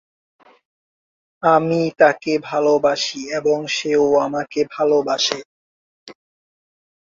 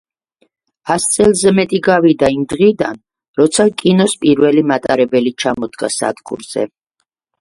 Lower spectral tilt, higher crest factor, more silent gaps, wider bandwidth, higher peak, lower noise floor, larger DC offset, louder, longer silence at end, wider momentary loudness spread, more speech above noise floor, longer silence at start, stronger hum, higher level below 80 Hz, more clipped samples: about the same, -4 dB/octave vs -4.5 dB/octave; about the same, 18 dB vs 14 dB; first, 5.45-6.06 s vs 3.28-3.34 s; second, 7.6 kHz vs 11.5 kHz; about the same, -2 dBFS vs 0 dBFS; first, under -90 dBFS vs -71 dBFS; neither; second, -18 LUFS vs -14 LUFS; first, 1 s vs 0.75 s; second, 7 LU vs 11 LU; first, over 72 dB vs 58 dB; first, 1.4 s vs 0.85 s; neither; second, -62 dBFS vs -48 dBFS; neither